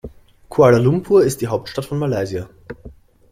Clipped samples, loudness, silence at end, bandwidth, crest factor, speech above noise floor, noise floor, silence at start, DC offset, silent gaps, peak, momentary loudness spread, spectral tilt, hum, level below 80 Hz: under 0.1%; -17 LUFS; 0.4 s; 16 kHz; 16 dB; 26 dB; -42 dBFS; 0.05 s; under 0.1%; none; -2 dBFS; 23 LU; -7 dB/octave; none; -46 dBFS